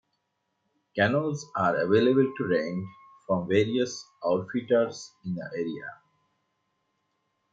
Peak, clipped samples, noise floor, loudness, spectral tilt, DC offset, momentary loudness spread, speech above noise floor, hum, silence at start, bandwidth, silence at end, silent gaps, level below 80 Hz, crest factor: -10 dBFS; under 0.1%; -78 dBFS; -27 LUFS; -6 dB/octave; under 0.1%; 13 LU; 52 dB; none; 0.95 s; 7.8 kHz; 1.6 s; none; -72 dBFS; 20 dB